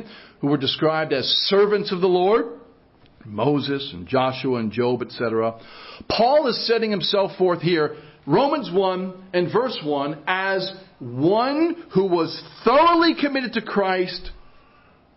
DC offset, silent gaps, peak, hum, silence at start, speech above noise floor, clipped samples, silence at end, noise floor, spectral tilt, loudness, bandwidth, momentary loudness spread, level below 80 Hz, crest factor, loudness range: under 0.1%; none; -2 dBFS; none; 0 s; 33 dB; under 0.1%; 0.8 s; -54 dBFS; -9.5 dB/octave; -21 LUFS; 5.8 kHz; 10 LU; -54 dBFS; 20 dB; 3 LU